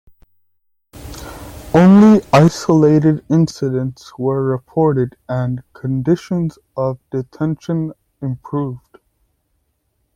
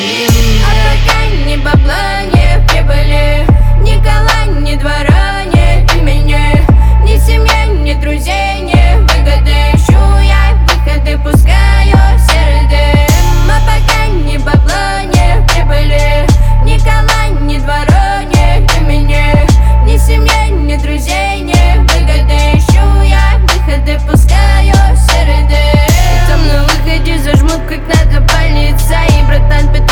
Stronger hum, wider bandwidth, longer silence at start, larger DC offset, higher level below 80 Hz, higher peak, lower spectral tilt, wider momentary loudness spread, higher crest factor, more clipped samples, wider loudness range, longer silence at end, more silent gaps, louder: neither; about the same, 16.5 kHz vs 17.5 kHz; first, 0.95 s vs 0 s; neither; second, -46 dBFS vs -8 dBFS; about the same, 0 dBFS vs 0 dBFS; first, -8 dB/octave vs -5.5 dB/octave; first, 18 LU vs 5 LU; first, 16 dB vs 6 dB; second, under 0.1% vs 0.8%; first, 11 LU vs 2 LU; first, 1.4 s vs 0 s; neither; second, -16 LUFS vs -9 LUFS